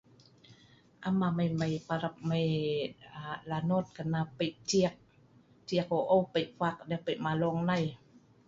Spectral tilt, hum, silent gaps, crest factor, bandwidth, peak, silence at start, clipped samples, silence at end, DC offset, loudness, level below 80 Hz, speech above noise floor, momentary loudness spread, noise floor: -6 dB/octave; none; none; 18 dB; 7.8 kHz; -14 dBFS; 0.5 s; under 0.1%; 0.5 s; under 0.1%; -32 LUFS; -66 dBFS; 30 dB; 9 LU; -62 dBFS